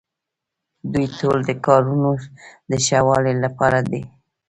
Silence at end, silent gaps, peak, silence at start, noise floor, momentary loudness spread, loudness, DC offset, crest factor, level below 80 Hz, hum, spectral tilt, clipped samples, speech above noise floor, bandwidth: 0.4 s; none; 0 dBFS; 0.85 s; -83 dBFS; 10 LU; -19 LUFS; under 0.1%; 20 dB; -50 dBFS; none; -5.5 dB/octave; under 0.1%; 64 dB; 10.5 kHz